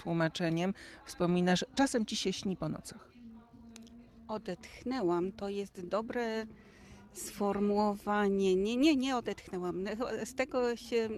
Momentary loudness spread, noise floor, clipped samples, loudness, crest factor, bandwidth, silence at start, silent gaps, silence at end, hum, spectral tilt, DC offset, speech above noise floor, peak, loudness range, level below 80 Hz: 19 LU; -54 dBFS; under 0.1%; -33 LUFS; 16 dB; 14.5 kHz; 0 s; none; 0 s; none; -5.5 dB/octave; under 0.1%; 21 dB; -18 dBFS; 7 LU; -62 dBFS